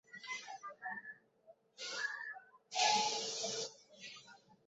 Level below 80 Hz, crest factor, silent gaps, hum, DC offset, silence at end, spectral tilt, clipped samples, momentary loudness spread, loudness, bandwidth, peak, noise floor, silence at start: -90 dBFS; 22 dB; none; none; under 0.1%; 0.1 s; 1.5 dB/octave; under 0.1%; 21 LU; -39 LUFS; 8 kHz; -20 dBFS; -67 dBFS; 0.1 s